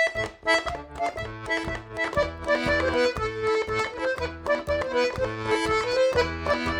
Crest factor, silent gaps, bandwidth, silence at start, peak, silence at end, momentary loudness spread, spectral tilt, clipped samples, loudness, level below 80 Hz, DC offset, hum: 16 dB; none; 18 kHz; 0 s; -10 dBFS; 0 s; 7 LU; -4.5 dB/octave; under 0.1%; -26 LUFS; -44 dBFS; under 0.1%; none